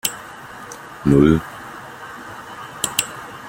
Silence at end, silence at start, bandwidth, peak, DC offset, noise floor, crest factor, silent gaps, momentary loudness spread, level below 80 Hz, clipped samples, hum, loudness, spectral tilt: 0 s; 0.05 s; 16.5 kHz; 0 dBFS; under 0.1%; -36 dBFS; 22 dB; none; 21 LU; -40 dBFS; under 0.1%; none; -18 LUFS; -5 dB/octave